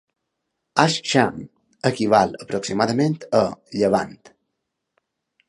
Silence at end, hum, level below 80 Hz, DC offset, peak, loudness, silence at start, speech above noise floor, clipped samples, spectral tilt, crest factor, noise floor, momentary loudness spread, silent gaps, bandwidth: 1.2 s; none; -58 dBFS; under 0.1%; 0 dBFS; -21 LUFS; 0.75 s; 58 dB; under 0.1%; -5 dB/octave; 22 dB; -78 dBFS; 8 LU; none; 11.5 kHz